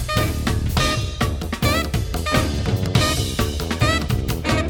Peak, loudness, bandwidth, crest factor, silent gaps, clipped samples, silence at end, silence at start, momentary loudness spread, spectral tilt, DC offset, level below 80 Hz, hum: -2 dBFS; -21 LUFS; 20 kHz; 18 dB; none; under 0.1%; 0 s; 0 s; 5 LU; -4.5 dB/octave; under 0.1%; -28 dBFS; none